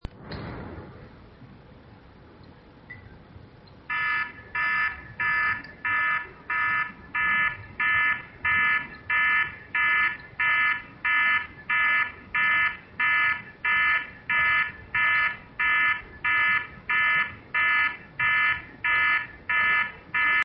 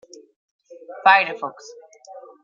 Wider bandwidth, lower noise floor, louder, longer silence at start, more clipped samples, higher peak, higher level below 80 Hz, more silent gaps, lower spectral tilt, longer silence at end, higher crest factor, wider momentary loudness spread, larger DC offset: second, 5.6 kHz vs 7.4 kHz; first, -50 dBFS vs -43 dBFS; second, -24 LUFS vs -18 LUFS; second, 0.15 s vs 0.9 s; neither; second, -12 dBFS vs 0 dBFS; first, -54 dBFS vs -84 dBFS; neither; first, -5 dB/octave vs -2 dB/octave; second, 0 s vs 0.25 s; second, 14 dB vs 24 dB; second, 7 LU vs 26 LU; neither